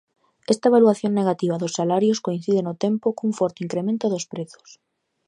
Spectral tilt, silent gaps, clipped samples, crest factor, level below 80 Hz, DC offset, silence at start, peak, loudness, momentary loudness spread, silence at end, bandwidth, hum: -6 dB/octave; none; under 0.1%; 18 dB; -72 dBFS; under 0.1%; 0.5 s; -4 dBFS; -22 LUFS; 11 LU; 0.85 s; 11 kHz; none